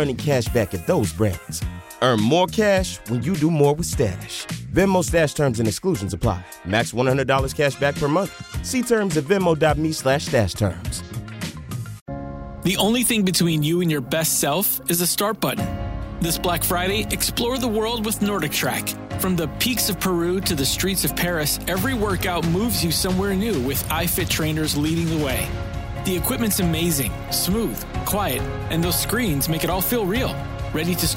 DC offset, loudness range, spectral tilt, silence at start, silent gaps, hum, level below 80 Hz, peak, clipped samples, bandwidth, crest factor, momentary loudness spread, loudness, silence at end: under 0.1%; 2 LU; -4.5 dB/octave; 0 s; 12.01-12.06 s; none; -36 dBFS; -6 dBFS; under 0.1%; 16.5 kHz; 16 dB; 9 LU; -21 LUFS; 0 s